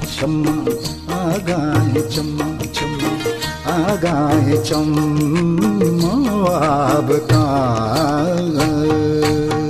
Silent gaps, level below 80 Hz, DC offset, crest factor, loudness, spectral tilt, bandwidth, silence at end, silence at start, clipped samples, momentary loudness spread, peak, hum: none; -38 dBFS; under 0.1%; 12 dB; -17 LUFS; -6 dB/octave; 14.5 kHz; 0 s; 0 s; under 0.1%; 6 LU; -4 dBFS; none